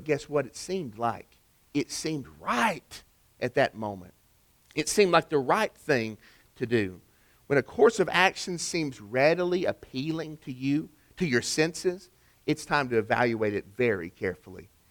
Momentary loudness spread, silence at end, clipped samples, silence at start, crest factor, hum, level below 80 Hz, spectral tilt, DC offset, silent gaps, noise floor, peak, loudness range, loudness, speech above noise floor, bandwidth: 14 LU; 0.25 s; under 0.1%; 0 s; 22 dB; none; -62 dBFS; -4.5 dB/octave; under 0.1%; none; -64 dBFS; -6 dBFS; 5 LU; -28 LUFS; 36 dB; 19.5 kHz